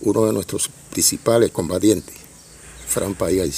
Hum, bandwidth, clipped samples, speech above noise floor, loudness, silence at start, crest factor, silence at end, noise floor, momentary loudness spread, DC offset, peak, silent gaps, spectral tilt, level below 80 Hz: none; 16 kHz; under 0.1%; 24 dB; -19 LUFS; 0 s; 18 dB; 0 s; -43 dBFS; 9 LU; under 0.1%; -2 dBFS; none; -4 dB/octave; -46 dBFS